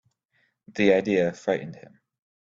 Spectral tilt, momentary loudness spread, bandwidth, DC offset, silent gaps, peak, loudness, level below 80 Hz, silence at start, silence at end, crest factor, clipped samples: -6.5 dB/octave; 16 LU; 7.6 kHz; under 0.1%; none; -6 dBFS; -24 LUFS; -64 dBFS; 0.75 s; 0.65 s; 20 dB; under 0.1%